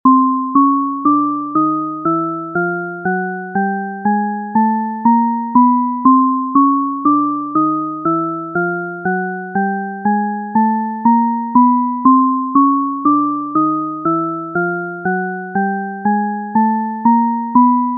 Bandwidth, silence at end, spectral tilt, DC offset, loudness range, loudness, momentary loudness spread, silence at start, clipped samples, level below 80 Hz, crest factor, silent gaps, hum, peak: 2.1 kHz; 0 s; -2.5 dB/octave; under 0.1%; 4 LU; -15 LUFS; 8 LU; 0.05 s; under 0.1%; -66 dBFS; 14 dB; none; none; 0 dBFS